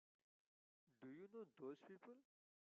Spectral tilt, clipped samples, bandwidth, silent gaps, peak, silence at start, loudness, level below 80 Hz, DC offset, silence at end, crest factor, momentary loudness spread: -6 dB/octave; under 0.1%; 4 kHz; none; -44 dBFS; 0.85 s; -60 LUFS; under -90 dBFS; under 0.1%; 0.5 s; 18 dB; 8 LU